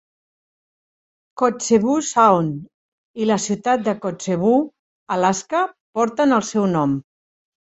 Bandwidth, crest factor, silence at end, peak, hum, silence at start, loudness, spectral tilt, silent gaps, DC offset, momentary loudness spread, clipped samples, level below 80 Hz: 8.2 kHz; 18 dB; 0.7 s; -2 dBFS; none; 1.35 s; -19 LUFS; -5 dB/octave; 2.74-3.14 s, 4.79-5.06 s, 5.80-5.93 s; under 0.1%; 10 LU; under 0.1%; -60 dBFS